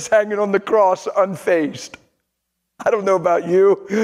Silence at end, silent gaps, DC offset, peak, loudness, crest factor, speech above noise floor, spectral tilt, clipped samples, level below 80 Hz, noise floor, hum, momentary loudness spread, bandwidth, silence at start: 0 s; none; under 0.1%; -2 dBFS; -17 LUFS; 16 dB; 58 dB; -5.5 dB/octave; under 0.1%; -64 dBFS; -75 dBFS; none; 9 LU; 12.5 kHz; 0 s